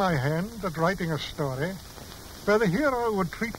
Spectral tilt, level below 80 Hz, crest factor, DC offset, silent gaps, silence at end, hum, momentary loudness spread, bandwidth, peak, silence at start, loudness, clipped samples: -6 dB/octave; -48 dBFS; 16 dB; under 0.1%; none; 0 s; none; 16 LU; 16 kHz; -12 dBFS; 0 s; -27 LUFS; under 0.1%